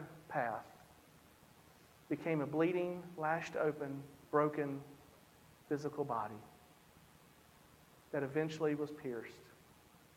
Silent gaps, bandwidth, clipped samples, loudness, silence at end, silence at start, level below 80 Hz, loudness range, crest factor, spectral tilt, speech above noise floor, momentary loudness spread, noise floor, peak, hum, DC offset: none; 16.5 kHz; under 0.1%; -39 LUFS; 0.6 s; 0 s; -76 dBFS; 7 LU; 22 dB; -7 dB/octave; 26 dB; 19 LU; -64 dBFS; -20 dBFS; none; under 0.1%